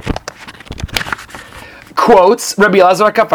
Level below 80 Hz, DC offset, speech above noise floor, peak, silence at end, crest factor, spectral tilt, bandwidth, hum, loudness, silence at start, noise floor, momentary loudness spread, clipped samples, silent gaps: -34 dBFS; under 0.1%; 26 dB; 0 dBFS; 0 s; 12 dB; -4 dB/octave; over 20 kHz; none; -11 LUFS; 0.05 s; -34 dBFS; 23 LU; 0.5%; none